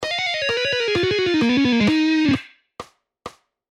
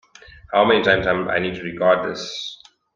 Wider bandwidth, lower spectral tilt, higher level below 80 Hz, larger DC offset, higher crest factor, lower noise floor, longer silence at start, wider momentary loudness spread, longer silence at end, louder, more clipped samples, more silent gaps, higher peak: first, 10.5 kHz vs 7.4 kHz; about the same, -5 dB/octave vs -5 dB/octave; about the same, -52 dBFS vs -50 dBFS; neither; about the same, 14 dB vs 18 dB; second, -41 dBFS vs -45 dBFS; second, 0 s vs 0.5 s; first, 23 LU vs 13 LU; about the same, 0.4 s vs 0.4 s; about the same, -19 LUFS vs -19 LUFS; neither; neither; second, -6 dBFS vs -2 dBFS